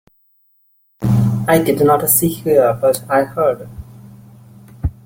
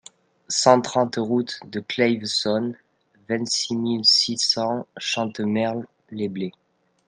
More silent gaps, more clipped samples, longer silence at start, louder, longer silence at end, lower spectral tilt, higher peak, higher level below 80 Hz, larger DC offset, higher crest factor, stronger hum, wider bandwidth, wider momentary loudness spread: neither; neither; first, 1 s vs 0.5 s; first, -15 LUFS vs -22 LUFS; second, 0.15 s vs 0.55 s; first, -5.5 dB/octave vs -3.5 dB/octave; about the same, 0 dBFS vs -2 dBFS; first, -38 dBFS vs -70 dBFS; neither; second, 16 dB vs 22 dB; neither; first, 17 kHz vs 11 kHz; about the same, 13 LU vs 13 LU